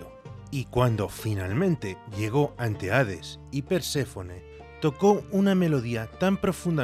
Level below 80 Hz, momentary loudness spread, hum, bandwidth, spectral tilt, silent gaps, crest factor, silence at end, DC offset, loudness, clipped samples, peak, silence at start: -52 dBFS; 14 LU; none; 15 kHz; -6.5 dB/octave; none; 18 dB; 0 s; under 0.1%; -27 LUFS; under 0.1%; -8 dBFS; 0 s